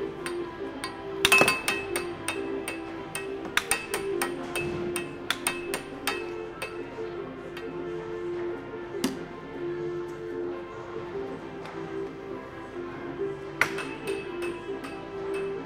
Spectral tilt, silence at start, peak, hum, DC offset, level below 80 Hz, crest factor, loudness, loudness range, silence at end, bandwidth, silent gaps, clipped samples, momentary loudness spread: -3 dB/octave; 0 s; -4 dBFS; none; under 0.1%; -56 dBFS; 28 dB; -31 LUFS; 9 LU; 0 s; 16.5 kHz; none; under 0.1%; 11 LU